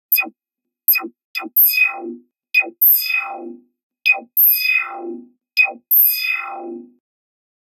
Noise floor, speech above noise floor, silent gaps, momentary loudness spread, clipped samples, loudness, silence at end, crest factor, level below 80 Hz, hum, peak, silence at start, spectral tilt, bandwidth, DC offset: -83 dBFS; 65 dB; 1.24-1.34 s, 3.83-3.90 s; 19 LU; under 0.1%; -14 LUFS; 0.9 s; 18 dB; under -90 dBFS; none; 0 dBFS; 0.1 s; 1 dB/octave; 16.5 kHz; under 0.1%